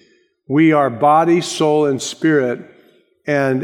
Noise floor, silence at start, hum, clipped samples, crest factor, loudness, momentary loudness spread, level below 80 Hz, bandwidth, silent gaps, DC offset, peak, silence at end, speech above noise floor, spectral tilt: -52 dBFS; 0.5 s; none; under 0.1%; 14 dB; -15 LUFS; 8 LU; -68 dBFS; 12 kHz; none; under 0.1%; -2 dBFS; 0 s; 38 dB; -5.5 dB/octave